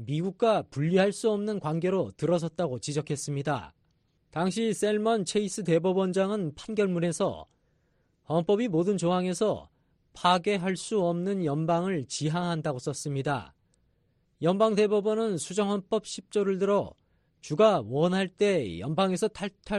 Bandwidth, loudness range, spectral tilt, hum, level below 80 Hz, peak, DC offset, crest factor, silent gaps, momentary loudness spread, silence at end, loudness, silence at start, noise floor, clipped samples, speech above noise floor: 11.5 kHz; 3 LU; -5.5 dB/octave; none; -62 dBFS; -8 dBFS; under 0.1%; 20 dB; none; 7 LU; 0 s; -28 LUFS; 0 s; -70 dBFS; under 0.1%; 43 dB